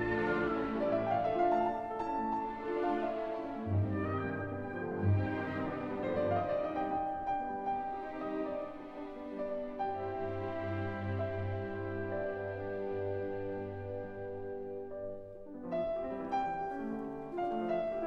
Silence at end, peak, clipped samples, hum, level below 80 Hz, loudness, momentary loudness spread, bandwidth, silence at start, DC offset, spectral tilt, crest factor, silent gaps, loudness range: 0 s; -20 dBFS; under 0.1%; none; -60 dBFS; -36 LUFS; 10 LU; 6 kHz; 0 s; under 0.1%; -9 dB/octave; 16 dB; none; 6 LU